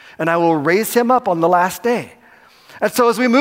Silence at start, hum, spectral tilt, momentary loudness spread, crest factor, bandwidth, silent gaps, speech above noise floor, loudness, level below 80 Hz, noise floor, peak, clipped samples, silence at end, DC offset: 0.2 s; none; -5 dB/octave; 7 LU; 14 dB; 16 kHz; none; 32 dB; -16 LUFS; -64 dBFS; -47 dBFS; -2 dBFS; under 0.1%; 0 s; under 0.1%